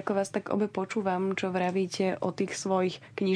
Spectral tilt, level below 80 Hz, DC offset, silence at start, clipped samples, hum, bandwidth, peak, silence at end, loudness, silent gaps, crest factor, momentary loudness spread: -5.5 dB/octave; -72 dBFS; under 0.1%; 0 s; under 0.1%; none; 11 kHz; -14 dBFS; 0 s; -30 LUFS; none; 16 dB; 3 LU